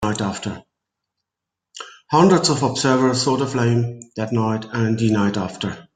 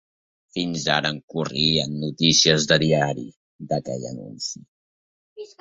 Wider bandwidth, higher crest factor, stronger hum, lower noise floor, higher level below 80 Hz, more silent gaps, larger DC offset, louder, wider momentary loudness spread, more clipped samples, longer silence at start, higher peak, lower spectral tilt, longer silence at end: first, 9.6 kHz vs 7.8 kHz; about the same, 18 dB vs 22 dB; neither; second, -84 dBFS vs under -90 dBFS; about the same, -54 dBFS vs -56 dBFS; second, none vs 1.23-1.28 s, 3.36-3.59 s, 4.68-5.36 s; neither; about the same, -19 LUFS vs -21 LUFS; second, 15 LU vs 18 LU; neither; second, 0 s vs 0.55 s; about the same, -2 dBFS vs -2 dBFS; first, -5.5 dB/octave vs -3.5 dB/octave; about the same, 0.15 s vs 0.15 s